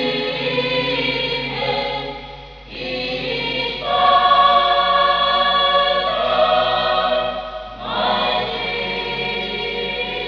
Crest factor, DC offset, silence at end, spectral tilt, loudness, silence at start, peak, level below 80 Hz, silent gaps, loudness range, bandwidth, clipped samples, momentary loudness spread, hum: 16 dB; under 0.1%; 0 s; -5 dB/octave; -18 LUFS; 0 s; -2 dBFS; -44 dBFS; none; 6 LU; 5.4 kHz; under 0.1%; 12 LU; none